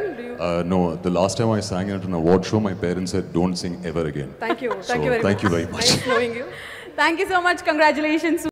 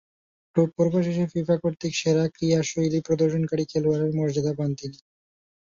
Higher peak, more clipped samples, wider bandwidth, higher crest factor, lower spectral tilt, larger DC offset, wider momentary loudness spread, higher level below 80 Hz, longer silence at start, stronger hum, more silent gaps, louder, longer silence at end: about the same, -6 dBFS vs -8 dBFS; neither; first, 16 kHz vs 7.6 kHz; about the same, 16 dB vs 18 dB; second, -4.5 dB/octave vs -6.5 dB/octave; neither; first, 9 LU vs 5 LU; first, -48 dBFS vs -60 dBFS; second, 0 s vs 0.55 s; neither; neither; first, -21 LUFS vs -24 LUFS; second, 0 s vs 0.85 s